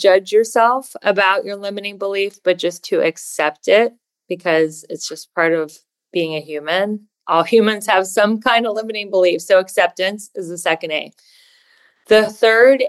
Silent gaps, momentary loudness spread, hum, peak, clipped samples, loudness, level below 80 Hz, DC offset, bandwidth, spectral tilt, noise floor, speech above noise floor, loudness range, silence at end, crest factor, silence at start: none; 11 LU; none; -2 dBFS; under 0.1%; -17 LUFS; -66 dBFS; under 0.1%; 12.5 kHz; -3.5 dB/octave; -55 dBFS; 39 dB; 3 LU; 0 s; 16 dB; 0 s